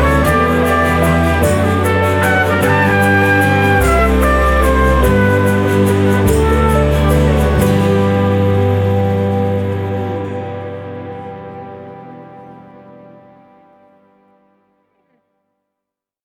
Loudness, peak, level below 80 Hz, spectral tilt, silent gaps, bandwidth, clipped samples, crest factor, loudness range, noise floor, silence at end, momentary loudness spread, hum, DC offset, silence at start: -13 LUFS; 0 dBFS; -22 dBFS; -6.5 dB/octave; none; 18 kHz; under 0.1%; 14 dB; 16 LU; -81 dBFS; 3.65 s; 16 LU; 50 Hz at -35 dBFS; under 0.1%; 0 s